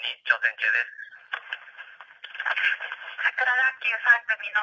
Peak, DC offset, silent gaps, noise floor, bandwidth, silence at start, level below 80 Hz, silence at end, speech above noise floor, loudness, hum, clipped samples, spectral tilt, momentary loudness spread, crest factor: -6 dBFS; under 0.1%; none; -46 dBFS; 7.4 kHz; 0 s; -90 dBFS; 0 s; 21 dB; -24 LUFS; none; under 0.1%; 1 dB/octave; 21 LU; 20 dB